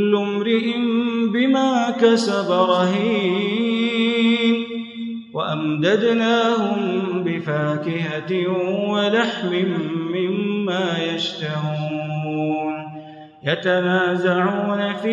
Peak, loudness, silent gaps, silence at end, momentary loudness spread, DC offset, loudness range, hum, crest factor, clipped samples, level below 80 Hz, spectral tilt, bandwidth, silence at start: -4 dBFS; -20 LUFS; none; 0 s; 8 LU; under 0.1%; 5 LU; none; 16 dB; under 0.1%; -72 dBFS; -6 dB/octave; 10.5 kHz; 0 s